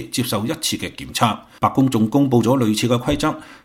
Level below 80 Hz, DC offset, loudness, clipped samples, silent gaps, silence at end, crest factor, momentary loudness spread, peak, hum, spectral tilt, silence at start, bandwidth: -44 dBFS; under 0.1%; -19 LUFS; under 0.1%; none; 0.1 s; 18 dB; 6 LU; 0 dBFS; none; -5 dB/octave; 0 s; 17 kHz